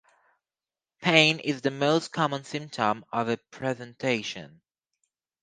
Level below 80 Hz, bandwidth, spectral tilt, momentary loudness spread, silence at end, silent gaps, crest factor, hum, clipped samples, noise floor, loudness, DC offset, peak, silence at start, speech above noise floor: -72 dBFS; 10 kHz; -4.5 dB/octave; 13 LU; 0.95 s; none; 26 dB; none; under 0.1%; under -90 dBFS; -26 LUFS; under 0.1%; -2 dBFS; 1 s; over 63 dB